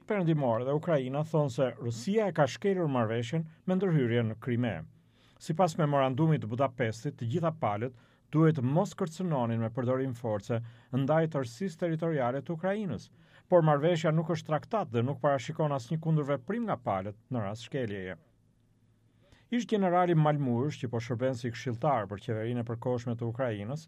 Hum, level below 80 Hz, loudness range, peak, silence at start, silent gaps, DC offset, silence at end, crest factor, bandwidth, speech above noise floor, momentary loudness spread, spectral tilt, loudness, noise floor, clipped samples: none; -70 dBFS; 3 LU; -12 dBFS; 0.1 s; none; under 0.1%; 0 s; 18 dB; 11 kHz; 37 dB; 9 LU; -7.5 dB/octave; -31 LUFS; -67 dBFS; under 0.1%